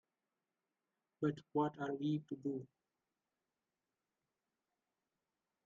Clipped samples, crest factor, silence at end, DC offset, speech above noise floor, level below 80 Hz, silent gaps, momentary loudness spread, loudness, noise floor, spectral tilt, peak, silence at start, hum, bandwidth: under 0.1%; 22 dB; 3 s; under 0.1%; over 50 dB; -86 dBFS; none; 5 LU; -41 LUFS; under -90 dBFS; -7 dB/octave; -24 dBFS; 1.2 s; none; 7.2 kHz